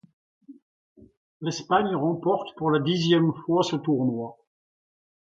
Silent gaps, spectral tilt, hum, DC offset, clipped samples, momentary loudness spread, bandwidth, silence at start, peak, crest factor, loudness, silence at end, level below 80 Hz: 0.62-0.96 s, 1.17-1.40 s; -6 dB/octave; none; under 0.1%; under 0.1%; 10 LU; 7.8 kHz; 0.5 s; -8 dBFS; 18 dB; -25 LUFS; 0.9 s; -66 dBFS